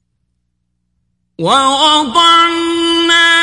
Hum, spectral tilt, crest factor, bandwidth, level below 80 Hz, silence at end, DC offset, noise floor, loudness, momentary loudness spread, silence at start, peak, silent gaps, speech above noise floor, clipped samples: 60 Hz at -50 dBFS; -2 dB/octave; 12 dB; 11.5 kHz; -52 dBFS; 0 s; under 0.1%; -67 dBFS; -9 LUFS; 6 LU; 1.4 s; 0 dBFS; none; 57 dB; under 0.1%